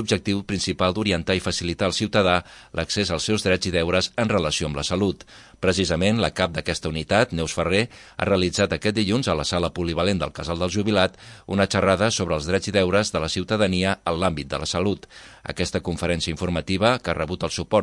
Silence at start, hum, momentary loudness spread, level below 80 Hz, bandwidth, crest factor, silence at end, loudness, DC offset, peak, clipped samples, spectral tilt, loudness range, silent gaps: 0 s; none; 6 LU; -46 dBFS; 11.5 kHz; 20 dB; 0 s; -23 LUFS; under 0.1%; -2 dBFS; under 0.1%; -4.5 dB/octave; 3 LU; none